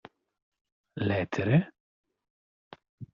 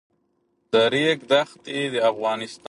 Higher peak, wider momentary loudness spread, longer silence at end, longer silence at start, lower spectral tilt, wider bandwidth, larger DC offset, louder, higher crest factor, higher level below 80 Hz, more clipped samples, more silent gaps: second, -12 dBFS vs -4 dBFS; first, 20 LU vs 7 LU; about the same, 0.1 s vs 0.15 s; first, 0.95 s vs 0.7 s; first, -7 dB/octave vs -4.5 dB/octave; second, 7.2 kHz vs 11.5 kHz; neither; second, -28 LUFS vs -22 LUFS; about the same, 20 dB vs 18 dB; about the same, -64 dBFS vs -68 dBFS; neither; first, 1.80-2.04 s, 2.30-2.71 s, 2.89-2.98 s vs none